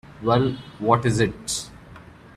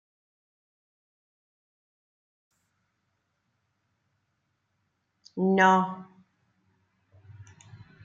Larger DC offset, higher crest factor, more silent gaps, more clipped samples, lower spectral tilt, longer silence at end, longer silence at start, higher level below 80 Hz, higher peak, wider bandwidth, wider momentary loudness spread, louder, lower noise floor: neither; about the same, 20 dB vs 24 dB; neither; neither; about the same, -5 dB/octave vs -6 dB/octave; second, 0.35 s vs 0.6 s; second, 0.05 s vs 5.35 s; first, -48 dBFS vs -80 dBFS; first, -4 dBFS vs -8 dBFS; first, 14 kHz vs 7.4 kHz; second, 9 LU vs 22 LU; about the same, -23 LUFS vs -23 LUFS; second, -45 dBFS vs -77 dBFS